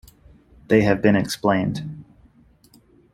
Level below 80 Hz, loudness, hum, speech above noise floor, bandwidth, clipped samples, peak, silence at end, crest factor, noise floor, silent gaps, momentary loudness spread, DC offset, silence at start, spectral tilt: -50 dBFS; -20 LUFS; none; 35 dB; 16 kHz; under 0.1%; -2 dBFS; 1.1 s; 20 dB; -54 dBFS; none; 17 LU; under 0.1%; 0.7 s; -6.5 dB/octave